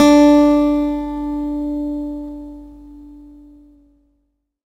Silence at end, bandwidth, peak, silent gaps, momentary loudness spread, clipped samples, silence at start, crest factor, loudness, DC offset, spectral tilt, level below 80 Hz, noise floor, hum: 1.5 s; 11.5 kHz; 0 dBFS; none; 22 LU; under 0.1%; 0 s; 16 dB; -16 LUFS; under 0.1%; -5 dB/octave; -40 dBFS; -68 dBFS; none